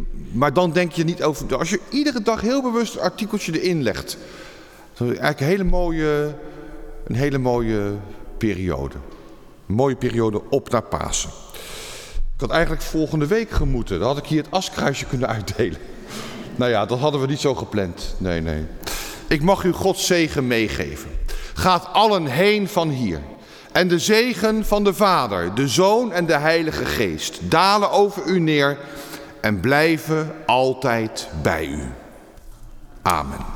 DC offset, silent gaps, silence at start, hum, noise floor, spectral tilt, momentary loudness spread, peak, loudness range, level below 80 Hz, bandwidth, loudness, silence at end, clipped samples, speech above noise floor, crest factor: under 0.1%; none; 0 s; none; -43 dBFS; -5 dB/octave; 15 LU; -4 dBFS; 5 LU; -34 dBFS; 19 kHz; -20 LUFS; 0 s; under 0.1%; 23 dB; 18 dB